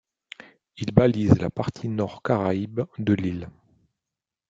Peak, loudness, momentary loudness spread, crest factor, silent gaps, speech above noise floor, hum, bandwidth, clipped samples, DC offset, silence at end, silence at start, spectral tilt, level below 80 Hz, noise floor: -2 dBFS; -24 LUFS; 23 LU; 22 dB; none; 65 dB; none; 7.8 kHz; under 0.1%; under 0.1%; 1 s; 0.75 s; -8.5 dB/octave; -50 dBFS; -88 dBFS